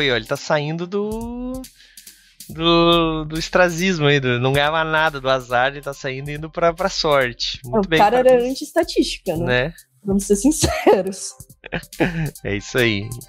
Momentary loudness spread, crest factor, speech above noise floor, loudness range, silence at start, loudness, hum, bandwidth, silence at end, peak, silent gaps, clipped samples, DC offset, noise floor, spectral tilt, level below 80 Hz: 13 LU; 18 dB; 25 dB; 3 LU; 0 s; -19 LUFS; none; 16 kHz; 0.05 s; 0 dBFS; none; under 0.1%; under 0.1%; -44 dBFS; -4.5 dB/octave; -40 dBFS